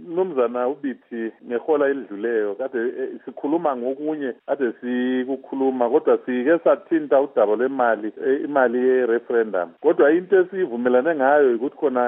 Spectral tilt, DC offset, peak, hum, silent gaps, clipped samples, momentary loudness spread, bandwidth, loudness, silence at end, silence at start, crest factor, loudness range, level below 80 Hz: -4.5 dB/octave; under 0.1%; -4 dBFS; none; none; under 0.1%; 9 LU; 3.7 kHz; -21 LUFS; 0 s; 0 s; 18 dB; 5 LU; -84 dBFS